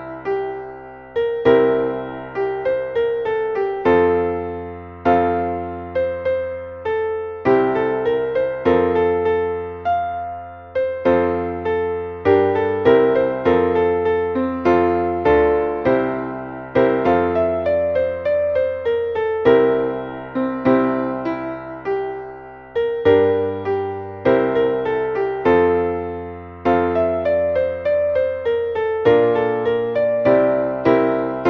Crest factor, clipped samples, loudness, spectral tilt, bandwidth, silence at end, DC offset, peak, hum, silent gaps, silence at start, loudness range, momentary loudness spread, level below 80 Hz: 18 dB; under 0.1%; -19 LUFS; -8.5 dB/octave; 5.6 kHz; 0 s; under 0.1%; -2 dBFS; none; none; 0 s; 3 LU; 11 LU; -46 dBFS